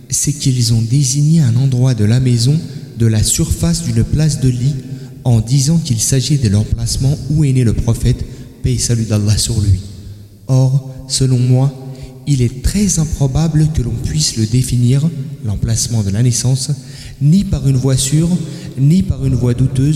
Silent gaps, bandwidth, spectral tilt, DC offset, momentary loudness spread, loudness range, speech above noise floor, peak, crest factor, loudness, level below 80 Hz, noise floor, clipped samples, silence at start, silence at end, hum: none; 14.5 kHz; -5.5 dB/octave; under 0.1%; 8 LU; 2 LU; 20 dB; -2 dBFS; 10 dB; -14 LUFS; -28 dBFS; -33 dBFS; under 0.1%; 0.1 s; 0 s; none